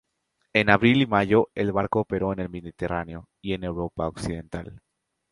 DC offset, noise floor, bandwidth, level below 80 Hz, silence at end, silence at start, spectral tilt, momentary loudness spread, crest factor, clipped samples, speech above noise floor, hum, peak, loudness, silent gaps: under 0.1%; -75 dBFS; 11.5 kHz; -48 dBFS; 0.55 s; 0.55 s; -7 dB/octave; 17 LU; 24 dB; under 0.1%; 51 dB; none; -2 dBFS; -24 LUFS; none